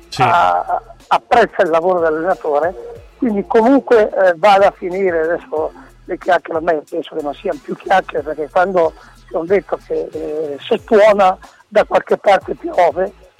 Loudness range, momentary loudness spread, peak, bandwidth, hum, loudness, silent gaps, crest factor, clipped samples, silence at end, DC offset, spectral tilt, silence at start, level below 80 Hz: 5 LU; 12 LU; -4 dBFS; 13 kHz; none; -15 LUFS; none; 12 dB; under 0.1%; 0.3 s; under 0.1%; -5.5 dB/octave; 0.1 s; -46 dBFS